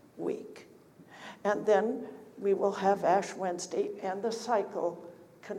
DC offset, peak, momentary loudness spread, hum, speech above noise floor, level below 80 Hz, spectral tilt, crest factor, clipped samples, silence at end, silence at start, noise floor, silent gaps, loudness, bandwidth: under 0.1%; -14 dBFS; 21 LU; none; 26 dB; -82 dBFS; -5 dB/octave; 18 dB; under 0.1%; 0 s; 0.15 s; -56 dBFS; none; -31 LUFS; 13.5 kHz